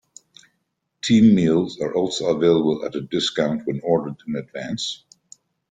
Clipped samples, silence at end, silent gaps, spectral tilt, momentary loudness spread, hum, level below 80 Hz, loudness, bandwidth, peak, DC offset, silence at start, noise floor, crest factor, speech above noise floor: under 0.1%; 0.75 s; none; -5.5 dB/octave; 14 LU; none; -58 dBFS; -21 LUFS; 9.2 kHz; -4 dBFS; under 0.1%; 1.05 s; -74 dBFS; 18 dB; 54 dB